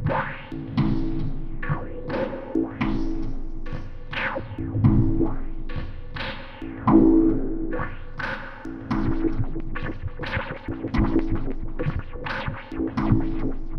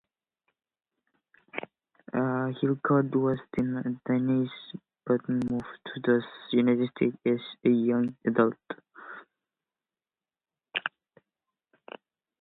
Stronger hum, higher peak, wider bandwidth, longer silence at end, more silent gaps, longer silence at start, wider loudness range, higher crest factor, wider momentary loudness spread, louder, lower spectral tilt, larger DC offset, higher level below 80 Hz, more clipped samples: neither; first, -4 dBFS vs -10 dBFS; first, 5.8 kHz vs 4.1 kHz; second, 0 s vs 1.55 s; neither; second, 0 s vs 1.55 s; second, 7 LU vs 12 LU; about the same, 20 dB vs 20 dB; second, 15 LU vs 20 LU; about the same, -26 LUFS vs -28 LUFS; about the same, -9 dB/octave vs -9 dB/octave; neither; first, -30 dBFS vs -68 dBFS; neither